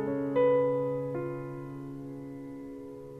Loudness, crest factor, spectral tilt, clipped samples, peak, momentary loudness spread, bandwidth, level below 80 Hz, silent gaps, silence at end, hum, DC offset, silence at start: -31 LUFS; 14 dB; -9 dB/octave; under 0.1%; -16 dBFS; 17 LU; 3.8 kHz; -64 dBFS; none; 0 s; none; under 0.1%; 0 s